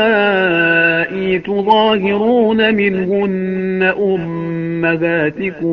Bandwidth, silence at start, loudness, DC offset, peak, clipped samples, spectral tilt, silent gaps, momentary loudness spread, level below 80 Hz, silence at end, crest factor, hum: 5.8 kHz; 0 s; -14 LUFS; under 0.1%; 0 dBFS; under 0.1%; -3.5 dB/octave; none; 7 LU; -50 dBFS; 0 s; 14 dB; none